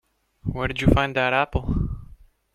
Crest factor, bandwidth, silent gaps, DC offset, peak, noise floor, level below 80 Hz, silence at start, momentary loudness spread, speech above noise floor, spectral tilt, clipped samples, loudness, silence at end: 22 dB; 13.5 kHz; none; under 0.1%; -2 dBFS; -48 dBFS; -34 dBFS; 0.45 s; 13 LU; 27 dB; -7 dB/octave; under 0.1%; -23 LUFS; 0.5 s